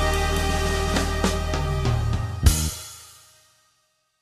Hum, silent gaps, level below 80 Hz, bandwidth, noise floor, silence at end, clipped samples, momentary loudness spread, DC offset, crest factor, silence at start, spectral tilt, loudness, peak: none; none; -28 dBFS; 14 kHz; -68 dBFS; 1.1 s; under 0.1%; 8 LU; under 0.1%; 20 dB; 0 s; -4.5 dB/octave; -24 LUFS; -4 dBFS